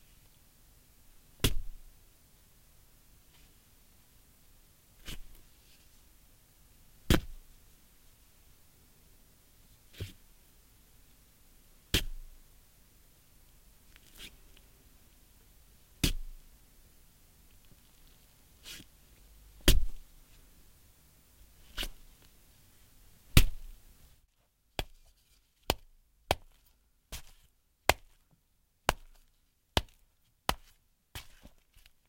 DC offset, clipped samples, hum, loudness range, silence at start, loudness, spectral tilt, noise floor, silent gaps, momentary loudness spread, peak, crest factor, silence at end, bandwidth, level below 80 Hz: under 0.1%; under 0.1%; none; 19 LU; 1.4 s; -35 LUFS; -3.5 dB/octave; -72 dBFS; none; 30 LU; -2 dBFS; 36 dB; 0.6 s; 16.5 kHz; -42 dBFS